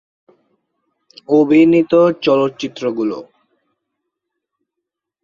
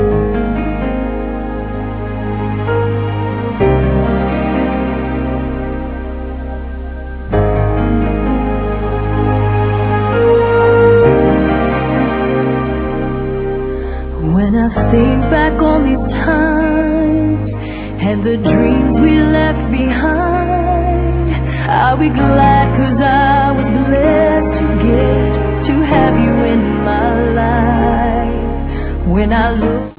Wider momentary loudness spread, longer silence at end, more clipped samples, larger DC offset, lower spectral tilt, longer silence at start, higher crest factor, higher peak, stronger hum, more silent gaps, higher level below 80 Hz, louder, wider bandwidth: about the same, 12 LU vs 10 LU; first, 2 s vs 0.05 s; neither; neither; second, -7 dB/octave vs -11.5 dB/octave; first, 1.3 s vs 0 s; about the same, 16 dB vs 12 dB; about the same, -2 dBFS vs 0 dBFS; neither; neither; second, -62 dBFS vs -22 dBFS; about the same, -14 LUFS vs -14 LUFS; first, 7.2 kHz vs 4 kHz